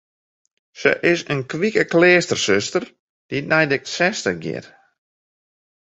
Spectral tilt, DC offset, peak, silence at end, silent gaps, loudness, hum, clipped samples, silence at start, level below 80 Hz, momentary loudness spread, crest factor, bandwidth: -4 dB/octave; under 0.1%; -2 dBFS; 1.2 s; 2.99-3.29 s; -19 LUFS; none; under 0.1%; 0.75 s; -58 dBFS; 14 LU; 20 dB; 8.2 kHz